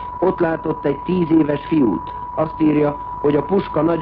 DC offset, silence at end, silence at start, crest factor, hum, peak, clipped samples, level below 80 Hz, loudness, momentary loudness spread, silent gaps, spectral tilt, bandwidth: under 0.1%; 0 s; 0 s; 12 dB; none; -6 dBFS; under 0.1%; -42 dBFS; -19 LUFS; 6 LU; none; -11 dB/octave; 4.9 kHz